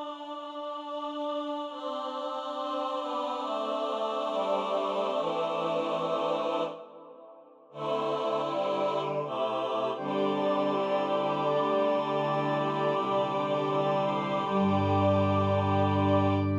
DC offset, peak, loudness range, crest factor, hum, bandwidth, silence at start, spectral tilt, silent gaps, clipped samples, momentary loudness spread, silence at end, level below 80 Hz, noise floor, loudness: under 0.1%; -14 dBFS; 5 LU; 16 dB; none; 9.6 kHz; 0 s; -7.5 dB/octave; none; under 0.1%; 9 LU; 0 s; -74 dBFS; -52 dBFS; -29 LUFS